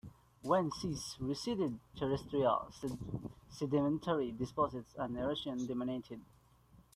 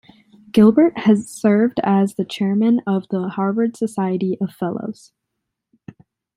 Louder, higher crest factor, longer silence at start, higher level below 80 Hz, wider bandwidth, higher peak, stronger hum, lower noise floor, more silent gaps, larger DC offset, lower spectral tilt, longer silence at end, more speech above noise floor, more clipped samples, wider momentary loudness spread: second, -37 LUFS vs -18 LUFS; about the same, 20 dB vs 16 dB; second, 0.05 s vs 0.55 s; about the same, -62 dBFS vs -60 dBFS; first, 14.5 kHz vs 12 kHz; second, -18 dBFS vs -2 dBFS; neither; second, -65 dBFS vs -78 dBFS; neither; neither; second, -6 dB/octave vs -7.5 dB/octave; second, 0.7 s vs 1.45 s; second, 28 dB vs 61 dB; neither; about the same, 11 LU vs 10 LU